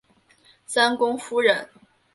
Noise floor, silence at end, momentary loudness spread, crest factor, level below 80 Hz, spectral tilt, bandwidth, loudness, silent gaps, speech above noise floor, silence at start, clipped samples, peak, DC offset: -58 dBFS; 0.5 s; 7 LU; 20 dB; -72 dBFS; -2 dB/octave; 11.5 kHz; -22 LUFS; none; 36 dB; 0.7 s; under 0.1%; -4 dBFS; under 0.1%